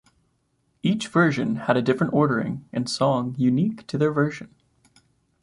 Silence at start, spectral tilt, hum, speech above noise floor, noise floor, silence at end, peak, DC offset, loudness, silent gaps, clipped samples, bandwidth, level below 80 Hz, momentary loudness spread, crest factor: 0.85 s; -6.5 dB/octave; none; 47 dB; -69 dBFS; 0.95 s; -4 dBFS; under 0.1%; -23 LUFS; none; under 0.1%; 11.5 kHz; -60 dBFS; 7 LU; 18 dB